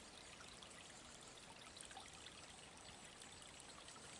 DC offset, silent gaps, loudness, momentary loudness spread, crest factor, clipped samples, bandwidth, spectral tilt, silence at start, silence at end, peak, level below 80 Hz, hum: under 0.1%; none; -57 LUFS; 2 LU; 24 dB; under 0.1%; 12 kHz; -1.5 dB/octave; 0 s; 0 s; -36 dBFS; -76 dBFS; none